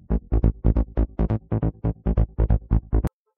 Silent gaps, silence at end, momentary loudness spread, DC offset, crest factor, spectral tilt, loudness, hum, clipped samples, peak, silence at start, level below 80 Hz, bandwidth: none; 0.3 s; 4 LU; under 0.1%; 18 dB; -11.5 dB/octave; -25 LUFS; none; under 0.1%; -4 dBFS; 0.1 s; -24 dBFS; 2.9 kHz